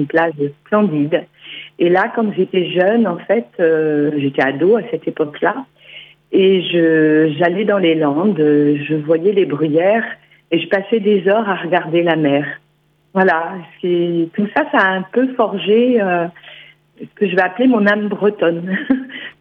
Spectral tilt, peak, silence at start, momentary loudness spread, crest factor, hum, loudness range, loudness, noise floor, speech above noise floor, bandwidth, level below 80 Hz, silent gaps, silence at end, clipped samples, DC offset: -9 dB/octave; 0 dBFS; 0 s; 8 LU; 16 dB; none; 3 LU; -15 LUFS; -58 dBFS; 43 dB; 5.4 kHz; -66 dBFS; none; 0.1 s; under 0.1%; under 0.1%